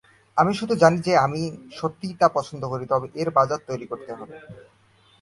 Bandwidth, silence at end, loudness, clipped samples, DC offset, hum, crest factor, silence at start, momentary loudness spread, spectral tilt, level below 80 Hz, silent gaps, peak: 11.5 kHz; 0.6 s; -23 LUFS; under 0.1%; under 0.1%; none; 22 dB; 0.35 s; 16 LU; -6 dB/octave; -58 dBFS; none; -2 dBFS